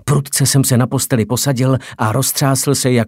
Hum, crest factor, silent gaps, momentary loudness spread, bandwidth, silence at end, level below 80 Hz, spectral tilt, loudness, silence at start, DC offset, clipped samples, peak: none; 14 dB; none; 4 LU; 16.5 kHz; 0 s; -48 dBFS; -4.5 dB/octave; -15 LUFS; 0.05 s; under 0.1%; under 0.1%; 0 dBFS